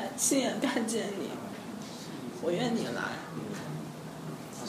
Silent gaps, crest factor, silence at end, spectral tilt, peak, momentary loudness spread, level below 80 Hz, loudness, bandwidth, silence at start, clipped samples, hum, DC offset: none; 18 dB; 0 s; -3.5 dB/octave; -16 dBFS; 14 LU; -70 dBFS; -34 LUFS; 15.5 kHz; 0 s; under 0.1%; none; under 0.1%